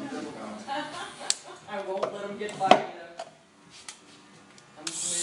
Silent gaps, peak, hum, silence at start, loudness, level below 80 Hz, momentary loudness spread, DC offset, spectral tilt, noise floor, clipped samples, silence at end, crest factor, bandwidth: none; 0 dBFS; none; 0 s; -30 LUFS; -76 dBFS; 23 LU; under 0.1%; -2 dB/octave; -54 dBFS; under 0.1%; 0 s; 32 dB; 14.5 kHz